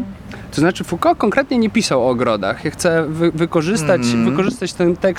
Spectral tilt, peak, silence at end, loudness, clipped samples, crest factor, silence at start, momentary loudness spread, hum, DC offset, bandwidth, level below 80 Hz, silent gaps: -5.5 dB/octave; -2 dBFS; 0 s; -17 LUFS; under 0.1%; 14 dB; 0 s; 4 LU; none; under 0.1%; 16 kHz; -44 dBFS; none